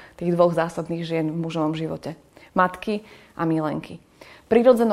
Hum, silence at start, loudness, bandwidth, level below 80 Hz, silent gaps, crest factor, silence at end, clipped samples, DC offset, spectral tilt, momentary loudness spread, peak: none; 0 s; -23 LUFS; 13.5 kHz; -58 dBFS; none; 20 dB; 0 s; under 0.1%; under 0.1%; -7.5 dB/octave; 18 LU; -4 dBFS